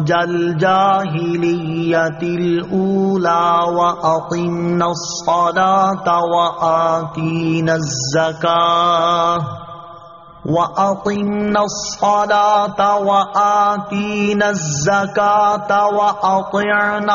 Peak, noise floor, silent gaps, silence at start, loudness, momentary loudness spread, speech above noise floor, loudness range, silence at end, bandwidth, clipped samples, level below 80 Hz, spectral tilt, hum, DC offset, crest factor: -2 dBFS; -38 dBFS; none; 0 s; -16 LUFS; 6 LU; 23 dB; 2 LU; 0 s; 7.4 kHz; under 0.1%; -52 dBFS; -4 dB/octave; none; 0.1%; 14 dB